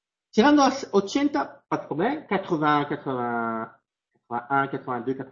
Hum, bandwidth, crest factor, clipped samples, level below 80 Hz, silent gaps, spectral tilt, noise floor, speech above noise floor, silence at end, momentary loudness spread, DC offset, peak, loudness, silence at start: none; 7.4 kHz; 20 dB; under 0.1%; -62 dBFS; none; -5.5 dB/octave; -75 dBFS; 51 dB; 0 s; 11 LU; under 0.1%; -6 dBFS; -25 LUFS; 0.35 s